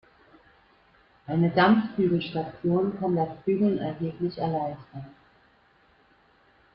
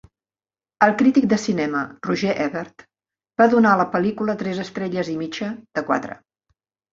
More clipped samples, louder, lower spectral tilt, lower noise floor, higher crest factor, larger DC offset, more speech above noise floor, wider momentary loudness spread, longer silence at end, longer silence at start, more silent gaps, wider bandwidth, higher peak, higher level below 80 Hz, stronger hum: neither; second, -26 LUFS vs -20 LUFS; first, -10.5 dB/octave vs -6 dB/octave; second, -62 dBFS vs under -90 dBFS; about the same, 20 dB vs 20 dB; neither; second, 36 dB vs over 70 dB; first, 19 LU vs 13 LU; first, 1.65 s vs 0.75 s; first, 1.3 s vs 0.8 s; neither; second, 5.6 kHz vs 7.6 kHz; second, -8 dBFS vs 0 dBFS; about the same, -62 dBFS vs -62 dBFS; neither